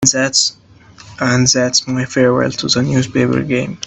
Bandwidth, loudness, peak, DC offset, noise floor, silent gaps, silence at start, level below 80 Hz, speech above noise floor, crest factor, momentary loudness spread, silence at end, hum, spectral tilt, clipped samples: 8.6 kHz; -14 LUFS; 0 dBFS; under 0.1%; -41 dBFS; none; 0 s; -46 dBFS; 26 dB; 16 dB; 6 LU; 0 s; none; -3.5 dB/octave; under 0.1%